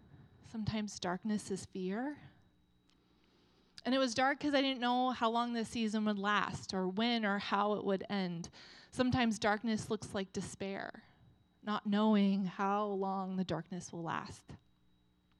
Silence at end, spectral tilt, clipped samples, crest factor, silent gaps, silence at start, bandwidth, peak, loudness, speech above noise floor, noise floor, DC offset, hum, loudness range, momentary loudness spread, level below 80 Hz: 0.85 s; -5 dB/octave; under 0.1%; 20 dB; none; 0.15 s; 11.5 kHz; -18 dBFS; -36 LUFS; 36 dB; -71 dBFS; under 0.1%; none; 6 LU; 12 LU; -68 dBFS